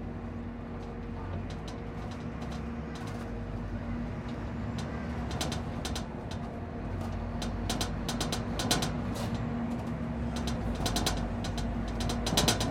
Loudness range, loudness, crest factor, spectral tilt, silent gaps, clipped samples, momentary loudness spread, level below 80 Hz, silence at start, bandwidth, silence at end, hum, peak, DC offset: 6 LU; -34 LUFS; 24 dB; -4.5 dB/octave; none; under 0.1%; 10 LU; -42 dBFS; 0 s; 16.5 kHz; 0 s; none; -10 dBFS; under 0.1%